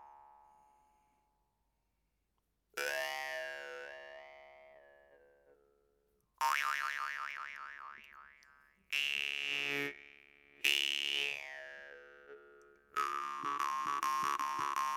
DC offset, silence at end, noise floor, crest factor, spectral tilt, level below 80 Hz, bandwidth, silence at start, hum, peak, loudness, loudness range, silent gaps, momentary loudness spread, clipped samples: under 0.1%; 0 s; -82 dBFS; 28 dB; 0 dB/octave; -80 dBFS; 19 kHz; 0 s; none; -12 dBFS; -36 LUFS; 9 LU; none; 23 LU; under 0.1%